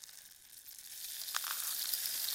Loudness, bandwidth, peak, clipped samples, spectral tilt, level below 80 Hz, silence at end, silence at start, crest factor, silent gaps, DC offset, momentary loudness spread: -37 LUFS; 17 kHz; -12 dBFS; under 0.1%; 3.5 dB/octave; -82 dBFS; 0 s; 0 s; 28 dB; none; under 0.1%; 18 LU